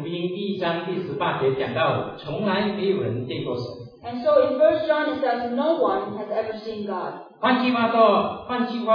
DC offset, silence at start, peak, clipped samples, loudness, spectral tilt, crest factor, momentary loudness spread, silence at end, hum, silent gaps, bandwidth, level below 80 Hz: under 0.1%; 0 s; -4 dBFS; under 0.1%; -23 LUFS; -8 dB/octave; 18 dB; 12 LU; 0 s; none; none; 5.4 kHz; -60 dBFS